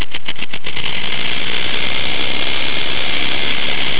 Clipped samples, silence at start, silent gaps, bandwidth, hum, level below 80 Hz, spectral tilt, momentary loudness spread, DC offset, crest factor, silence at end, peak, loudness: under 0.1%; 0 s; none; 4 kHz; none; -42 dBFS; -6.5 dB/octave; 7 LU; 40%; 16 dB; 0 s; -2 dBFS; -18 LUFS